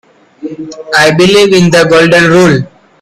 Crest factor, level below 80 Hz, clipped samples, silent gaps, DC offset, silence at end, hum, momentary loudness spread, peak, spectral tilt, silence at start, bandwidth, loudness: 8 dB; -42 dBFS; 0.5%; none; under 0.1%; 0.35 s; none; 19 LU; 0 dBFS; -5 dB/octave; 0.4 s; 14 kHz; -6 LUFS